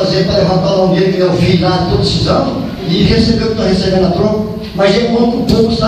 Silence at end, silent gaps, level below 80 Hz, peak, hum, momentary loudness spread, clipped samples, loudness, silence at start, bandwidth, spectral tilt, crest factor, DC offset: 0 s; none; -28 dBFS; 0 dBFS; none; 4 LU; under 0.1%; -12 LUFS; 0 s; 14 kHz; -6.5 dB/octave; 10 dB; under 0.1%